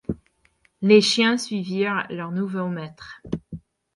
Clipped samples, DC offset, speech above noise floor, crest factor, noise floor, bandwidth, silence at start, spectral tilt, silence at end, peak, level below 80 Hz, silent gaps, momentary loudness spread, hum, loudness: under 0.1%; under 0.1%; 42 dB; 20 dB; -64 dBFS; 11.5 kHz; 0.1 s; -4.5 dB/octave; 0.35 s; -4 dBFS; -54 dBFS; none; 21 LU; none; -22 LUFS